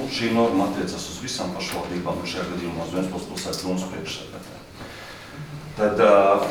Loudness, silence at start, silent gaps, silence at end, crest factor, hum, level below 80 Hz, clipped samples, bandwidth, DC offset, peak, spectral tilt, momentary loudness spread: -24 LUFS; 0 s; none; 0 s; 20 dB; none; -52 dBFS; under 0.1%; over 20 kHz; under 0.1%; -4 dBFS; -5 dB/octave; 21 LU